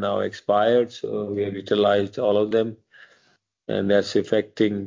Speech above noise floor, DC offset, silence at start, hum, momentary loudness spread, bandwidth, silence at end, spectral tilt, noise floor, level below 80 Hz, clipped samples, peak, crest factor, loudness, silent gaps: 43 dB; under 0.1%; 0 s; none; 8 LU; 7.6 kHz; 0 s; -6 dB/octave; -64 dBFS; -58 dBFS; under 0.1%; -6 dBFS; 16 dB; -22 LUFS; none